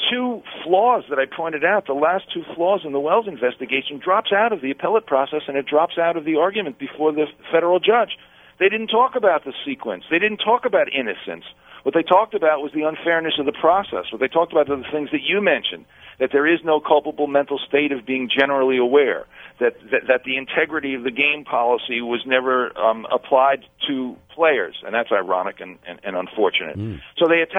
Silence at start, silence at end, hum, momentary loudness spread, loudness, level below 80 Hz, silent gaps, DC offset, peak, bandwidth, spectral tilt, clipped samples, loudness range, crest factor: 0 s; 0 s; none; 10 LU; -20 LUFS; -62 dBFS; none; under 0.1%; 0 dBFS; 3.9 kHz; -7 dB/octave; under 0.1%; 1 LU; 20 dB